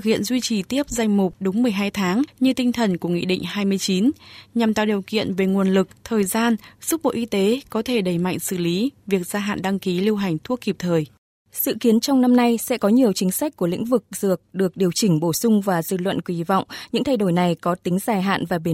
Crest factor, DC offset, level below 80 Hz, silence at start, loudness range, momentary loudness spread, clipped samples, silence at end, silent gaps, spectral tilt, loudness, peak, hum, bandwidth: 16 dB; under 0.1%; -56 dBFS; 0 s; 3 LU; 6 LU; under 0.1%; 0 s; 11.18-11.45 s; -5.5 dB/octave; -21 LUFS; -6 dBFS; none; 16.5 kHz